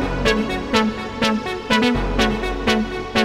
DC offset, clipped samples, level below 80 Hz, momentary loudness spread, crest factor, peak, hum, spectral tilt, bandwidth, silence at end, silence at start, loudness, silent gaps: under 0.1%; under 0.1%; -30 dBFS; 4 LU; 18 dB; -2 dBFS; none; -4.5 dB/octave; 15.5 kHz; 0 s; 0 s; -20 LUFS; none